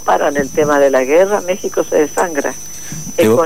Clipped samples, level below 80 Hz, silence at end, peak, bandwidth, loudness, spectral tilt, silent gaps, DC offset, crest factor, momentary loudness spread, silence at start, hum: under 0.1%; -48 dBFS; 0 s; -2 dBFS; 16 kHz; -14 LUFS; -4 dB/octave; none; 3%; 12 dB; 11 LU; 0 s; none